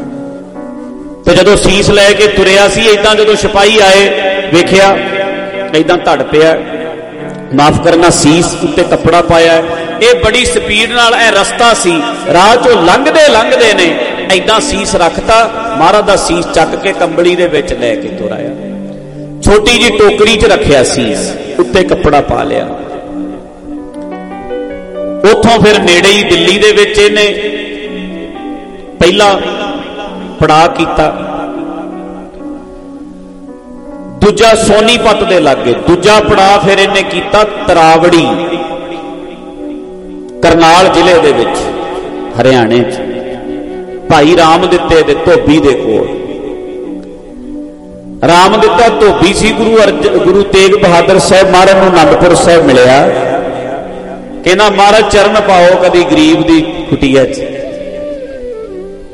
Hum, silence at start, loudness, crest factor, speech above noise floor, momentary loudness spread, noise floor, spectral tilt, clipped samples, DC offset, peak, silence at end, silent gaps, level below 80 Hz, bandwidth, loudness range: none; 0 s; -7 LUFS; 8 dB; 22 dB; 18 LU; -28 dBFS; -4 dB/octave; 1%; under 0.1%; 0 dBFS; 0 s; none; -28 dBFS; 14 kHz; 6 LU